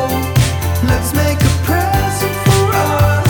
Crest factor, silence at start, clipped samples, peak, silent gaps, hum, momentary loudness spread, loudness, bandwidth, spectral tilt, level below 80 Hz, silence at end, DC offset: 10 dB; 0 s; under 0.1%; -2 dBFS; none; none; 3 LU; -14 LUFS; 19.5 kHz; -5.5 dB/octave; -26 dBFS; 0 s; under 0.1%